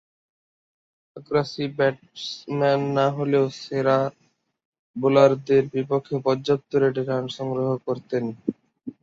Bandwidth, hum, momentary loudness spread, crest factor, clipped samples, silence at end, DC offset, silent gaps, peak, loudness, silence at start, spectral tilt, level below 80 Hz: 7.6 kHz; none; 12 LU; 20 dB; under 0.1%; 0.1 s; under 0.1%; 4.65-4.73 s, 4.79-4.94 s; -4 dBFS; -23 LUFS; 1.15 s; -7 dB/octave; -64 dBFS